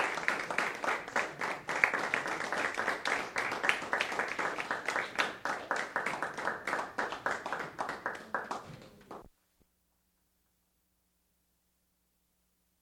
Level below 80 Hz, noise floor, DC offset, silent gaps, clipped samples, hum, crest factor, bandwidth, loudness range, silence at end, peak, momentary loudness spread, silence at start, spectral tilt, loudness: -72 dBFS; -77 dBFS; under 0.1%; none; under 0.1%; none; 32 dB; 18.5 kHz; 11 LU; 3.55 s; -6 dBFS; 8 LU; 0 s; -2.5 dB/octave; -34 LUFS